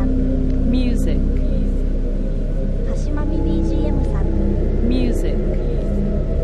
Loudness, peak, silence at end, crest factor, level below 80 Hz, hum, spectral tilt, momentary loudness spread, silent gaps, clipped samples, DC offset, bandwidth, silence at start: -21 LUFS; -6 dBFS; 0 s; 12 dB; -18 dBFS; none; -8.5 dB/octave; 5 LU; none; under 0.1%; 0.9%; 7.8 kHz; 0 s